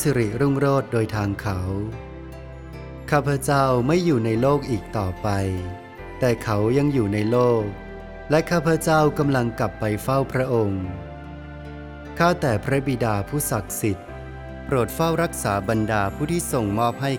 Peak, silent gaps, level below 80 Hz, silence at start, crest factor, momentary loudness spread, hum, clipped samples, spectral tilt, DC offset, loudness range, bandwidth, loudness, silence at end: -4 dBFS; none; -42 dBFS; 0 s; 18 dB; 18 LU; none; under 0.1%; -6 dB/octave; under 0.1%; 3 LU; 18.5 kHz; -22 LUFS; 0 s